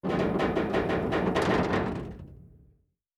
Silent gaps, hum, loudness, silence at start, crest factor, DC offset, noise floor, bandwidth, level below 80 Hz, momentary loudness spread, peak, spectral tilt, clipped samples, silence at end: none; none; -28 LUFS; 0.05 s; 16 dB; under 0.1%; -66 dBFS; 13 kHz; -46 dBFS; 12 LU; -12 dBFS; -7 dB/octave; under 0.1%; 0.7 s